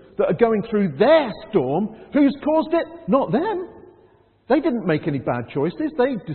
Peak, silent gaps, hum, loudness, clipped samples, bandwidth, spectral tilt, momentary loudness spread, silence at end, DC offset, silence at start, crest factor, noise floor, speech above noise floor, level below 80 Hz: -4 dBFS; none; none; -21 LUFS; under 0.1%; 4.4 kHz; -12 dB/octave; 8 LU; 0 s; under 0.1%; 0.2 s; 18 dB; -55 dBFS; 35 dB; -54 dBFS